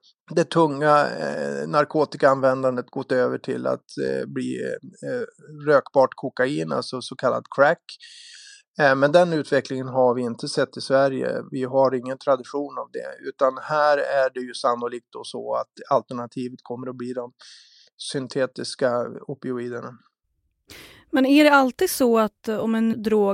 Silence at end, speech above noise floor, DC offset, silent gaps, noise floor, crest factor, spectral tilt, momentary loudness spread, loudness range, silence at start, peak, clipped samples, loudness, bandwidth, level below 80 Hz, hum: 0 s; 51 dB; under 0.1%; 8.68-8.74 s, 17.93-17.98 s; -73 dBFS; 20 dB; -5.5 dB/octave; 15 LU; 8 LU; 0.3 s; -2 dBFS; under 0.1%; -22 LUFS; 16 kHz; -68 dBFS; none